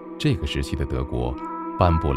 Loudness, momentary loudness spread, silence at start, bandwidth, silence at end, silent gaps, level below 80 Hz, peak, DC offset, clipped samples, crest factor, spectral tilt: -25 LUFS; 9 LU; 0 s; 13 kHz; 0 s; none; -32 dBFS; -4 dBFS; under 0.1%; under 0.1%; 20 dB; -7 dB/octave